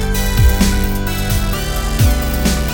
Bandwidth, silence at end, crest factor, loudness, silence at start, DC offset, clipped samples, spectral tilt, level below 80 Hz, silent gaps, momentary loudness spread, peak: 19 kHz; 0 s; 14 dB; -16 LUFS; 0 s; under 0.1%; under 0.1%; -5 dB/octave; -16 dBFS; none; 6 LU; 0 dBFS